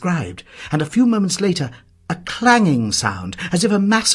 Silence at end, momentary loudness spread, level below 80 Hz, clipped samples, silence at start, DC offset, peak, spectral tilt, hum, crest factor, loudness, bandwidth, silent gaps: 0 s; 14 LU; -52 dBFS; under 0.1%; 0 s; under 0.1%; -2 dBFS; -4 dB/octave; none; 16 dB; -18 LUFS; 12 kHz; none